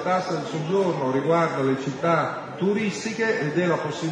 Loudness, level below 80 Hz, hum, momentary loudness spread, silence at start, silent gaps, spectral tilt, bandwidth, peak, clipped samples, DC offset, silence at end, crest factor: -24 LUFS; -68 dBFS; none; 5 LU; 0 s; none; -6 dB/octave; 10 kHz; -10 dBFS; under 0.1%; under 0.1%; 0 s; 14 dB